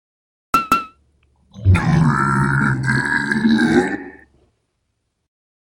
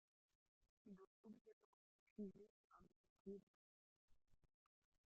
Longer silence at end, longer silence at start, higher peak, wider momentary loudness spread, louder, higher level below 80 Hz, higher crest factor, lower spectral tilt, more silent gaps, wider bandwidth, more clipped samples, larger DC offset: first, 1.6 s vs 0.6 s; about the same, 0.55 s vs 0.6 s; first, 0 dBFS vs -44 dBFS; about the same, 8 LU vs 10 LU; first, -17 LUFS vs -62 LUFS; first, -38 dBFS vs -88 dBFS; about the same, 18 dB vs 22 dB; second, -6.5 dB/octave vs -8.5 dB/octave; second, none vs 0.69-0.85 s, 1.07-1.24 s, 1.41-1.45 s, 1.53-2.16 s, 2.50-2.70 s, 2.96-3.25 s, 3.43-4.08 s; first, 17 kHz vs 3.5 kHz; neither; neither